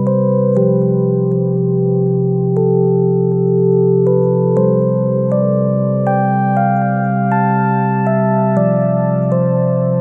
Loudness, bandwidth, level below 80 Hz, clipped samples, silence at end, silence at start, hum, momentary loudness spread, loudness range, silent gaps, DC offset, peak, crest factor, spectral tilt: -14 LUFS; 2.8 kHz; -64 dBFS; under 0.1%; 0 s; 0 s; none; 2 LU; 1 LU; none; under 0.1%; -2 dBFS; 12 dB; -12.5 dB/octave